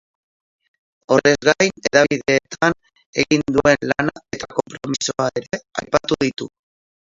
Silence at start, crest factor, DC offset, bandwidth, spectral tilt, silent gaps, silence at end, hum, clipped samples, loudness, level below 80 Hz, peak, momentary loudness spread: 1.1 s; 20 dB; under 0.1%; 7.8 kHz; -4 dB/octave; 3.06-3.13 s; 0.55 s; none; under 0.1%; -19 LUFS; -50 dBFS; 0 dBFS; 12 LU